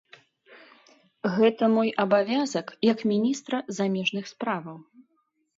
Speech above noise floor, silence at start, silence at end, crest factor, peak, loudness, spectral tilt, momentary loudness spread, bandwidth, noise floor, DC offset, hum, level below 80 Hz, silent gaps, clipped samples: 48 dB; 0.5 s; 0.75 s; 18 dB; -8 dBFS; -25 LUFS; -5.5 dB/octave; 9 LU; 7.8 kHz; -72 dBFS; under 0.1%; none; -76 dBFS; none; under 0.1%